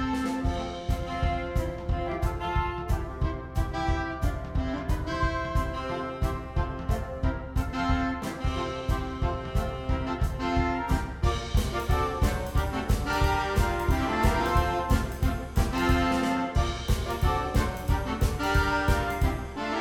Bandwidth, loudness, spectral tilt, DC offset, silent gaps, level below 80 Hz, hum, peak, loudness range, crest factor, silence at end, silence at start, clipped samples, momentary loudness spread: 17.5 kHz; -29 LUFS; -6 dB/octave; under 0.1%; none; -32 dBFS; none; -10 dBFS; 4 LU; 16 dB; 0 s; 0 s; under 0.1%; 6 LU